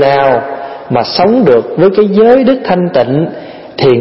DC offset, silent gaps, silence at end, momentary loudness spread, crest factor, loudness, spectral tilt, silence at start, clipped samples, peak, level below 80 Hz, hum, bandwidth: under 0.1%; none; 0 s; 13 LU; 8 dB; -9 LUFS; -9 dB/octave; 0 s; 0.2%; 0 dBFS; -46 dBFS; none; 5.8 kHz